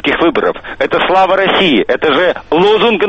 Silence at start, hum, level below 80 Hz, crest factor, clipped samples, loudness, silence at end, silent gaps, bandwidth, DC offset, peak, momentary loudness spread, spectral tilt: 0.05 s; none; -42 dBFS; 10 dB; under 0.1%; -11 LUFS; 0 s; none; 8.2 kHz; under 0.1%; 0 dBFS; 6 LU; -6 dB/octave